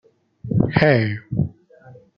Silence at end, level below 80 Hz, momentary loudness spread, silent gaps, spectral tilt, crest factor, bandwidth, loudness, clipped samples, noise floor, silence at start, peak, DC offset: 0.25 s; -46 dBFS; 11 LU; none; -9.5 dB/octave; 20 dB; 5.6 kHz; -20 LUFS; under 0.1%; -47 dBFS; 0.45 s; -2 dBFS; under 0.1%